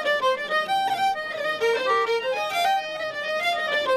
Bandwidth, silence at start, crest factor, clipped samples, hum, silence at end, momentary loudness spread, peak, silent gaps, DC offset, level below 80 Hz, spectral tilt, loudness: 13.5 kHz; 0 s; 12 dB; under 0.1%; none; 0 s; 5 LU; -12 dBFS; none; under 0.1%; -66 dBFS; -1.5 dB/octave; -24 LUFS